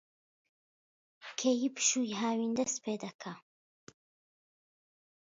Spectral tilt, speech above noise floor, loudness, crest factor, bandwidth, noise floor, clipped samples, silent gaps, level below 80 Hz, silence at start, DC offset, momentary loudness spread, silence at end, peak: -3 dB/octave; over 57 dB; -33 LUFS; 22 dB; 7.6 kHz; under -90 dBFS; under 0.1%; 3.15-3.19 s; -82 dBFS; 1.2 s; under 0.1%; 17 LU; 1.85 s; -16 dBFS